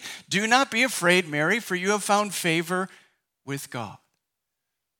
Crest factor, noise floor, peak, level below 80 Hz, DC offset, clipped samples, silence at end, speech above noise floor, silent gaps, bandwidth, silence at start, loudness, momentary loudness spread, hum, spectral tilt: 20 dB; -83 dBFS; -6 dBFS; -80 dBFS; under 0.1%; under 0.1%; 1.05 s; 59 dB; none; 19 kHz; 0 s; -23 LUFS; 15 LU; none; -3.5 dB/octave